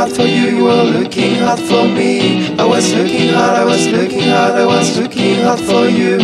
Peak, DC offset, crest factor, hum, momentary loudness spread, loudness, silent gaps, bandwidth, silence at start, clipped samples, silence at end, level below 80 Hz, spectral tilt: 0 dBFS; under 0.1%; 10 dB; none; 3 LU; -12 LUFS; none; 13 kHz; 0 s; under 0.1%; 0 s; -52 dBFS; -4.5 dB/octave